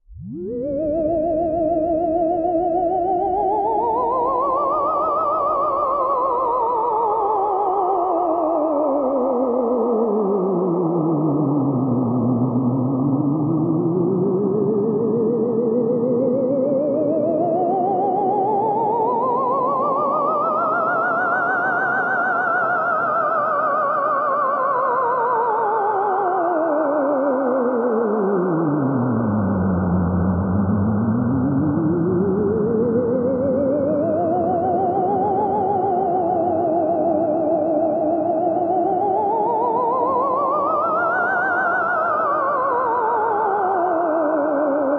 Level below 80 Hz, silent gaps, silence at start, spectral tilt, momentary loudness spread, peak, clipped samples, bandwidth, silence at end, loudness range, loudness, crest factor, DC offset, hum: -52 dBFS; none; 0.1 s; -11.5 dB/octave; 1 LU; -8 dBFS; under 0.1%; 4.7 kHz; 0 s; 1 LU; -19 LUFS; 12 dB; under 0.1%; none